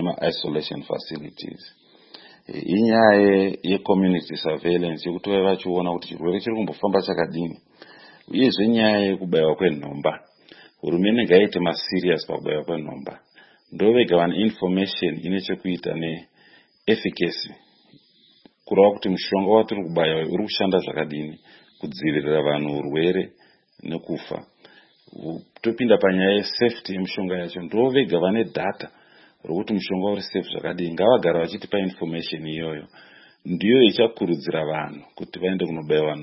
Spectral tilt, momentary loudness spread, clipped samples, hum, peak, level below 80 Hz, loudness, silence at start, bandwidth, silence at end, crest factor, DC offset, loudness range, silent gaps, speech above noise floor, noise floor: -10 dB/octave; 17 LU; under 0.1%; none; 0 dBFS; -62 dBFS; -22 LUFS; 0 s; 5.8 kHz; 0 s; 22 dB; under 0.1%; 5 LU; none; 35 dB; -56 dBFS